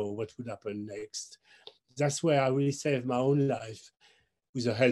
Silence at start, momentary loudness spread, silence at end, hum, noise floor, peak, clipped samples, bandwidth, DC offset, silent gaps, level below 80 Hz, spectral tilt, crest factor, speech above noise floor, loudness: 0 s; 18 LU; 0 s; none; -66 dBFS; -12 dBFS; under 0.1%; 12 kHz; under 0.1%; 4.49-4.53 s; -74 dBFS; -5.5 dB/octave; 18 dB; 36 dB; -31 LUFS